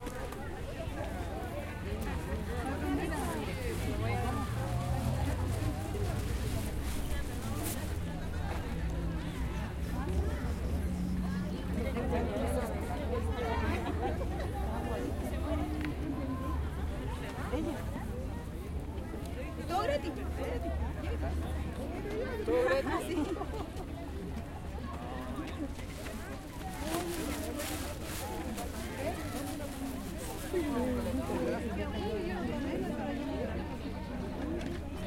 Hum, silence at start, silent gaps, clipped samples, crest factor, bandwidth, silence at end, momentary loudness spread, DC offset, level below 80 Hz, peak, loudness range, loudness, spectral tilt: none; 0 s; none; under 0.1%; 18 dB; 16.5 kHz; 0 s; 7 LU; under 0.1%; -42 dBFS; -16 dBFS; 4 LU; -36 LUFS; -6 dB/octave